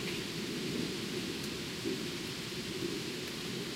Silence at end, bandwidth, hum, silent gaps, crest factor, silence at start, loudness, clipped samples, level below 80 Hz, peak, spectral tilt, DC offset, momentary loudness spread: 0 s; 16 kHz; none; none; 14 dB; 0 s; -37 LUFS; under 0.1%; -62 dBFS; -24 dBFS; -3.5 dB/octave; under 0.1%; 2 LU